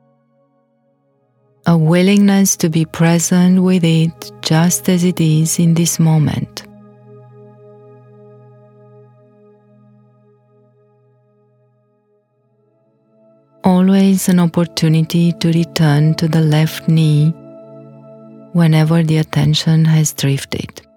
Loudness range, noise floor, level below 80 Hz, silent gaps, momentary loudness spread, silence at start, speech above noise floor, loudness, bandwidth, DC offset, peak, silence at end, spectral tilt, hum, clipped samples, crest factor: 6 LU; -60 dBFS; -52 dBFS; none; 7 LU; 1.65 s; 47 dB; -13 LUFS; 16.5 kHz; under 0.1%; 0 dBFS; 0.15 s; -5.5 dB/octave; none; under 0.1%; 16 dB